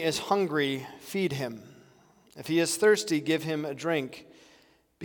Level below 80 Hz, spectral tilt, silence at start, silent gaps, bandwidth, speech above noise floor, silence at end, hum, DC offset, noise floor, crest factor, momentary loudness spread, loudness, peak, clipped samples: -72 dBFS; -4 dB/octave; 0 s; none; 18 kHz; 34 dB; 0 s; none; under 0.1%; -62 dBFS; 18 dB; 15 LU; -28 LUFS; -10 dBFS; under 0.1%